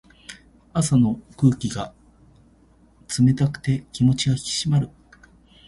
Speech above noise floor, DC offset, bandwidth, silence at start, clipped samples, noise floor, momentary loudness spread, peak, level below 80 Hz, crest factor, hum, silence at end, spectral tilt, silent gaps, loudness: 35 dB; under 0.1%; 11.5 kHz; 0.3 s; under 0.1%; -55 dBFS; 15 LU; -4 dBFS; -50 dBFS; 18 dB; none; 0.8 s; -5.5 dB/octave; none; -22 LUFS